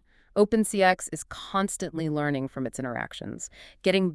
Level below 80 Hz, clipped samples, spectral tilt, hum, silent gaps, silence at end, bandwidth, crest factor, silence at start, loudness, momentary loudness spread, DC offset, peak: -56 dBFS; under 0.1%; -4.5 dB/octave; none; none; 0 s; 12 kHz; 20 dB; 0.35 s; -27 LUFS; 14 LU; under 0.1%; -6 dBFS